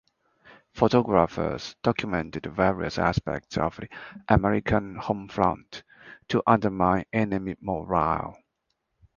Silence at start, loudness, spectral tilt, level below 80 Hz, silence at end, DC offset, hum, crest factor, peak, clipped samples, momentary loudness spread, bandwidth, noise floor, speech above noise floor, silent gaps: 0.75 s; -26 LUFS; -7 dB/octave; -46 dBFS; 0.85 s; under 0.1%; none; 24 dB; -2 dBFS; under 0.1%; 13 LU; 7.2 kHz; -78 dBFS; 53 dB; none